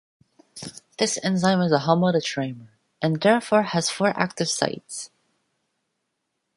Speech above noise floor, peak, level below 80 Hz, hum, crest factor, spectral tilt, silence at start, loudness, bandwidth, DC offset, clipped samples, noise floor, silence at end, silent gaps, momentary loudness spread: 56 dB; -2 dBFS; -66 dBFS; none; 22 dB; -4.5 dB/octave; 0.55 s; -22 LUFS; 11.5 kHz; under 0.1%; under 0.1%; -78 dBFS; 1.5 s; none; 18 LU